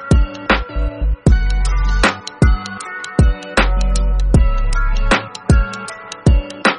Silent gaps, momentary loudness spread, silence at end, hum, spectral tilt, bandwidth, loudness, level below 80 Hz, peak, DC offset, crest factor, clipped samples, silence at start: none; 7 LU; 0 s; none; -5.5 dB/octave; 10.5 kHz; -17 LUFS; -16 dBFS; 0 dBFS; under 0.1%; 14 dB; under 0.1%; 0 s